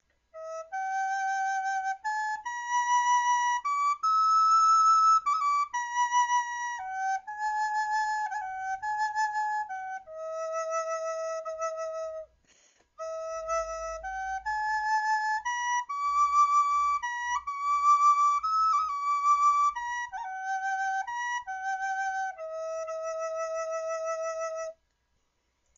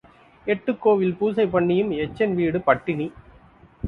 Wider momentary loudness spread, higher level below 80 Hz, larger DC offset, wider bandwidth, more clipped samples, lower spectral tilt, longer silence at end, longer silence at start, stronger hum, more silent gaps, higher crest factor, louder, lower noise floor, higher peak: first, 13 LU vs 8 LU; second, -64 dBFS vs -54 dBFS; neither; first, 7.6 kHz vs 4.8 kHz; neither; second, 4 dB/octave vs -9 dB/octave; first, 1.05 s vs 0 s; about the same, 0.35 s vs 0.45 s; neither; neither; second, 14 dB vs 20 dB; second, -28 LUFS vs -22 LUFS; first, -75 dBFS vs -51 dBFS; second, -14 dBFS vs -2 dBFS